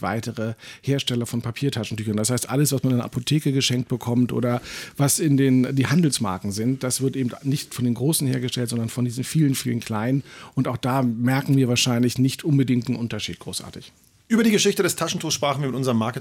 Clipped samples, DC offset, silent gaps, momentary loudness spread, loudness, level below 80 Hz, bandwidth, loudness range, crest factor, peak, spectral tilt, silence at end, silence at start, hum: under 0.1%; under 0.1%; none; 9 LU; -22 LUFS; -60 dBFS; 17.5 kHz; 2 LU; 14 dB; -8 dBFS; -5 dB/octave; 0 s; 0 s; none